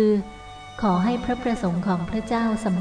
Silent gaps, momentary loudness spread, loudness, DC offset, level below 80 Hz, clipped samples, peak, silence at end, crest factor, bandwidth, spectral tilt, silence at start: none; 12 LU; -24 LUFS; under 0.1%; -44 dBFS; under 0.1%; -10 dBFS; 0 s; 14 dB; 10 kHz; -7.5 dB/octave; 0 s